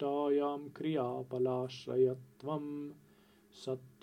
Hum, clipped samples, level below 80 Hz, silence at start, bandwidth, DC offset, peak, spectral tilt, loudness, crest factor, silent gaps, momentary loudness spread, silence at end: none; under 0.1%; -82 dBFS; 0 s; 10 kHz; under 0.1%; -20 dBFS; -7.5 dB/octave; -36 LUFS; 16 dB; none; 12 LU; 0.15 s